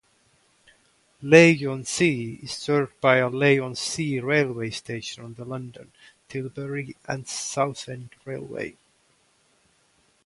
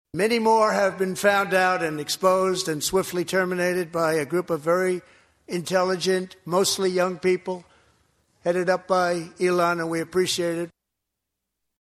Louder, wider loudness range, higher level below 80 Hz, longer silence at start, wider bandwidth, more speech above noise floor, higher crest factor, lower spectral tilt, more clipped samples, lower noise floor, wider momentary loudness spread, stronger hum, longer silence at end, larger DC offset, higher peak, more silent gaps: about the same, -23 LUFS vs -23 LUFS; first, 12 LU vs 3 LU; about the same, -64 dBFS vs -62 dBFS; first, 1.2 s vs 0.15 s; second, 11.5 kHz vs 15 kHz; second, 40 dB vs 59 dB; first, 24 dB vs 18 dB; about the same, -5 dB/octave vs -4 dB/octave; neither; second, -64 dBFS vs -82 dBFS; first, 18 LU vs 7 LU; neither; first, 1.55 s vs 1.15 s; neither; first, 0 dBFS vs -6 dBFS; neither